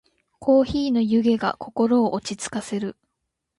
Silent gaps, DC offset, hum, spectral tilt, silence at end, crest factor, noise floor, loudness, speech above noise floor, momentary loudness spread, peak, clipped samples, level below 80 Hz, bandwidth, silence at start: none; under 0.1%; none; -5.5 dB/octave; 0.65 s; 16 dB; -79 dBFS; -22 LUFS; 58 dB; 10 LU; -6 dBFS; under 0.1%; -52 dBFS; 11.5 kHz; 0.4 s